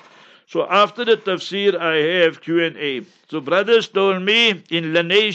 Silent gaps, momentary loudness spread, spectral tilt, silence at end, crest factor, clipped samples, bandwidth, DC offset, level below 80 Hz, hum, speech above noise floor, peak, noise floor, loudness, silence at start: none; 10 LU; -4.5 dB/octave; 0 s; 16 dB; under 0.1%; 8.2 kHz; under 0.1%; -74 dBFS; none; 30 dB; -2 dBFS; -48 dBFS; -17 LUFS; 0.5 s